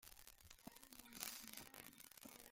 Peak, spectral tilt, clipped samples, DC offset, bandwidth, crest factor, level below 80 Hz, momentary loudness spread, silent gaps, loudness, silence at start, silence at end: -20 dBFS; -1 dB/octave; under 0.1%; under 0.1%; 16.5 kHz; 38 dB; -76 dBFS; 11 LU; none; -56 LUFS; 0 s; 0 s